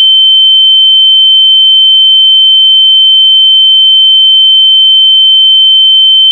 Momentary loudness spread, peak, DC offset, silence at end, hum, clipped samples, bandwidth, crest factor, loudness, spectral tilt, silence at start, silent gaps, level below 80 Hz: 0 LU; 0 dBFS; under 0.1%; 0 s; none; under 0.1%; 3.4 kHz; 4 dB; 0 LUFS; 9.5 dB/octave; 0 s; none; under -90 dBFS